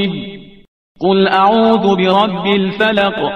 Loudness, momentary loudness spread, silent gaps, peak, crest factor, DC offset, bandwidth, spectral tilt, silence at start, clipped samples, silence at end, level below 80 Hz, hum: -13 LUFS; 9 LU; 0.68-0.95 s; 0 dBFS; 14 dB; 0.4%; 6.4 kHz; -7 dB/octave; 0 s; under 0.1%; 0 s; -52 dBFS; none